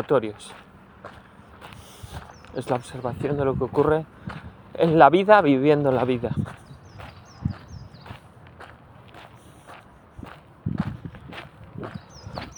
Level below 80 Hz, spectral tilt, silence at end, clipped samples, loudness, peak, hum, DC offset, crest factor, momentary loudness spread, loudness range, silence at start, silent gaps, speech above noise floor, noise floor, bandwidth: -52 dBFS; -7.5 dB/octave; 0.05 s; under 0.1%; -22 LUFS; 0 dBFS; none; under 0.1%; 24 dB; 28 LU; 20 LU; 0 s; none; 27 dB; -47 dBFS; over 20 kHz